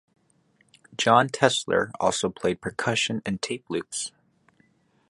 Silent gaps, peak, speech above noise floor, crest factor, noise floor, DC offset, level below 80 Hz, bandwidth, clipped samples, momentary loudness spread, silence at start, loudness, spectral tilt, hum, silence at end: none; -2 dBFS; 40 dB; 26 dB; -65 dBFS; under 0.1%; -60 dBFS; 11.5 kHz; under 0.1%; 12 LU; 1 s; -25 LUFS; -3.5 dB/octave; none; 1 s